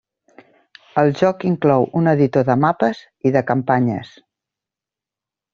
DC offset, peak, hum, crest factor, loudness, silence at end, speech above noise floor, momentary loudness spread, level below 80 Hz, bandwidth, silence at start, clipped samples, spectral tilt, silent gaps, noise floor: under 0.1%; -2 dBFS; none; 16 dB; -17 LUFS; 1.45 s; 71 dB; 6 LU; -58 dBFS; 7.2 kHz; 0.95 s; under 0.1%; -7 dB/octave; none; -88 dBFS